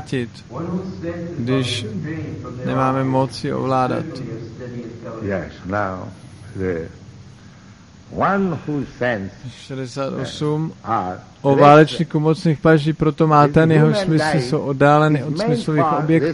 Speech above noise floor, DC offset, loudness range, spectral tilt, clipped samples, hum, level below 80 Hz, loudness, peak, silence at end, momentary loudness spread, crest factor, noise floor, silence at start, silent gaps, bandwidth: 25 dB; under 0.1%; 12 LU; -7 dB/octave; under 0.1%; none; -48 dBFS; -18 LUFS; 0 dBFS; 0 s; 17 LU; 18 dB; -43 dBFS; 0 s; none; 11.5 kHz